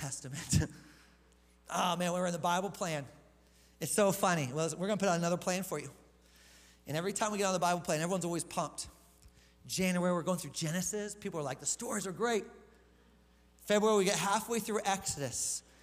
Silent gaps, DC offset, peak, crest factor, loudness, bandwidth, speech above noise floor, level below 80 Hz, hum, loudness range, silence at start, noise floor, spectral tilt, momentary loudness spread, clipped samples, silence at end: none; under 0.1%; -16 dBFS; 20 dB; -34 LUFS; 16 kHz; 31 dB; -60 dBFS; none; 3 LU; 0 s; -65 dBFS; -4 dB/octave; 10 LU; under 0.1%; 0.25 s